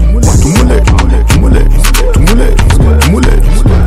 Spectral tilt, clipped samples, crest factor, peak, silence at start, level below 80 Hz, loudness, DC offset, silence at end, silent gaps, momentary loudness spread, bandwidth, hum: -5.5 dB/octave; 0.3%; 4 dB; 0 dBFS; 0 s; -6 dBFS; -8 LUFS; under 0.1%; 0 s; none; 2 LU; 15.5 kHz; none